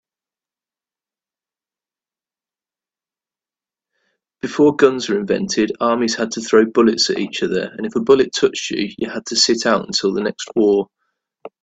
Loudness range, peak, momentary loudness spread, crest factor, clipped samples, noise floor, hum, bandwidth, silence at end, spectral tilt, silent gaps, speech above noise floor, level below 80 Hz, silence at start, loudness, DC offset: 5 LU; 0 dBFS; 9 LU; 20 dB; under 0.1%; under -90 dBFS; none; 9 kHz; 0.15 s; -3.5 dB/octave; none; over 73 dB; -60 dBFS; 4.45 s; -17 LUFS; under 0.1%